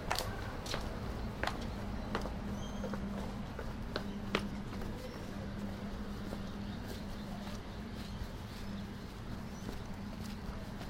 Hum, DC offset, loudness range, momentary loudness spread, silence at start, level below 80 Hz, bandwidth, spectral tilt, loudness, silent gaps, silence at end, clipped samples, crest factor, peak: none; under 0.1%; 4 LU; 7 LU; 0 s; -46 dBFS; 16 kHz; -5.5 dB/octave; -42 LUFS; none; 0 s; under 0.1%; 26 dB; -14 dBFS